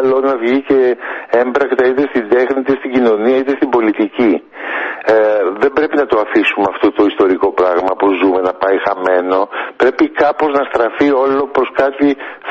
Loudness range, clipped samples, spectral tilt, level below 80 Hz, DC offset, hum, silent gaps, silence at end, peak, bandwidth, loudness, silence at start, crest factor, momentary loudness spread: 1 LU; under 0.1%; -6.5 dB/octave; -52 dBFS; under 0.1%; none; none; 0 s; 0 dBFS; 7 kHz; -13 LUFS; 0 s; 12 dB; 4 LU